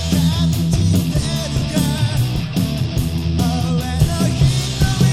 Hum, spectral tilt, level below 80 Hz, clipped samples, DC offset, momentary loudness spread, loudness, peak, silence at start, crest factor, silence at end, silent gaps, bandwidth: none; -5.5 dB/octave; -28 dBFS; under 0.1%; 0.7%; 4 LU; -18 LUFS; -2 dBFS; 0 s; 14 dB; 0 s; none; 16 kHz